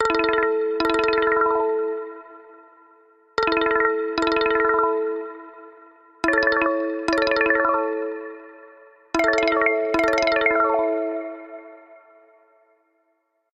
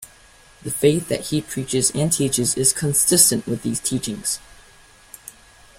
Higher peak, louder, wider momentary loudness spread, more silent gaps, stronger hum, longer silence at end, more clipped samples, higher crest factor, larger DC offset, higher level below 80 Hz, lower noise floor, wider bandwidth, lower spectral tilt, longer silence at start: second, -6 dBFS vs 0 dBFS; about the same, -21 LUFS vs -19 LUFS; about the same, 16 LU vs 15 LU; neither; neither; first, 1.6 s vs 0.5 s; neither; second, 16 dB vs 22 dB; neither; about the same, -54 dBFS vs -50 dBFS; first, -70 dBFS vs -50 dBFS; second, 9.8 kHz vs 16.5 kHz; about the same, -4 dB/octave vs -3.5 dB/octave; about the same, 0 s vs 0 s